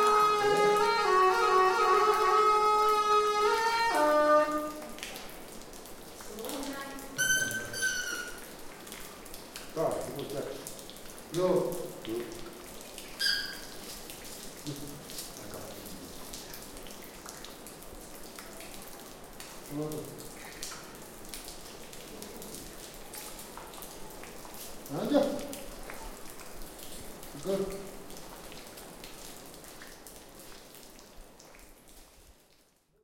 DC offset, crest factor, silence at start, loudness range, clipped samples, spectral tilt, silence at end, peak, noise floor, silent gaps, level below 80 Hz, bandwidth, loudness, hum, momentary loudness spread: under 0.1%; 20 dB; 0 s; 19 LU; under 0.1%; -3 dB/octave; 0.7 s; -12 dBFS; -66 dBFS; none; -54 dBFS; 17 kHz; -29 LUFS; none; 21 LU